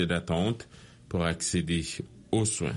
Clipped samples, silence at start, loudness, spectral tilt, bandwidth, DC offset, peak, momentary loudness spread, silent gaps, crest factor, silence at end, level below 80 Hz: under 0.1%; 0 s; -30 LUFS; -4.5 dB/octave; 11.5 kHz; under 0.1%; -12 dBFS; 10 LU; none; 18 dB; 0 s; -48 dBFS